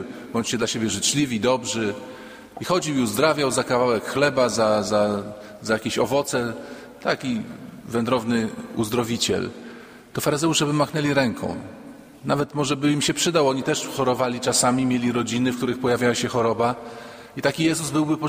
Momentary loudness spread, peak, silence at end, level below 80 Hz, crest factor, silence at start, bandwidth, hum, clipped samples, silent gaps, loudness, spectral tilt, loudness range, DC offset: 15 LU; -4 dBFS; 0 s; -56 dBFS; 20 dB; 0 s; 16 kHz; none; under 0.1%; none; -22 LUFS; -4 dB/octave; 4 LU; under 0.1%